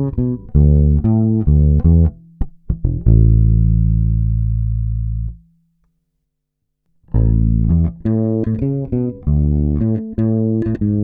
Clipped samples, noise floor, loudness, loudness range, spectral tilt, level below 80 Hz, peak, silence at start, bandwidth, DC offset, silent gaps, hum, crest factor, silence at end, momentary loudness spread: under 0.1%; -73 dBFS; -16 LUFS; 7 LU; -14.5 dB/octave; -20 dBFS; -2 dBFS; 0 s; 2 kHz; under 0.1%; none; none; 14 dB; 0 s; 10 LU